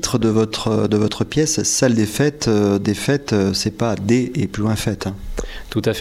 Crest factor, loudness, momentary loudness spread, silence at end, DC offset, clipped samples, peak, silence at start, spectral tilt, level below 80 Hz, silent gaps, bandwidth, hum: 16 dB; -18 LUFS; 8 LU; 0 s; under 0.1%; under 0.1%; -4 dBFS; 0 s; -5 dB/octave; -38 dBFS; none; 16 kHz; none